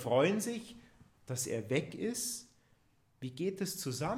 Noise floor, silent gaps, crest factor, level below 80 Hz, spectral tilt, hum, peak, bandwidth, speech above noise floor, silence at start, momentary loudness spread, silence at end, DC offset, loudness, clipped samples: -71 dBFS; none; 20 dB; -70 dBFS; -4.5 dB/octave; none; -18 dBFS; 16 kHz; 36 dB; 0 s; 14 LU; 0 s; under 0.1%; -36 LUFS; under 0.1%